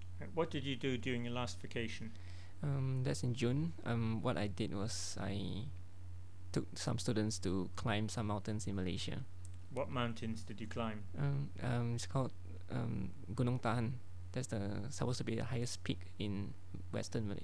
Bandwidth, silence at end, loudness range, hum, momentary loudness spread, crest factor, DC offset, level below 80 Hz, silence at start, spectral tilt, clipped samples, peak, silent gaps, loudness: 11 kHz; 0 s; 2 LU; none; 10 LU; 18 dB; 0.6%; -62 dBFS; 0 s; -5.5 dB/octave; under 0.1%; -22 dBFS; none; -41 LUFS